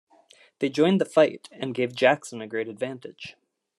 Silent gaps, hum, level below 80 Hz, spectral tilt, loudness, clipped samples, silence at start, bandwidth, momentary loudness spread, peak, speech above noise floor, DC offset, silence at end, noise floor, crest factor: none; none; -76 dBFS; -5.5 dB/octave; -25 LUFS; under 0.1%; 0.6 s; 12.5 kHz; 18 LU; -4 dBFS; 32 dB; under 0.1%; 0.45 s; -57 dBFS; 22 dB